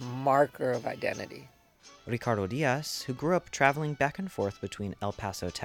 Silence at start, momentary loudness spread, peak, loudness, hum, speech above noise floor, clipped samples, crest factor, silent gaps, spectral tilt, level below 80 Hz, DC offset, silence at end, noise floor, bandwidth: 0 s; 12 LU; -6 dBFS; -30 LUFS; none; 27 dB; under 0.1%; 24 dB; none; -5 dB/octave; -60 dBFS; under 0.1%; 0 s; -57 dBFS; 18 kHz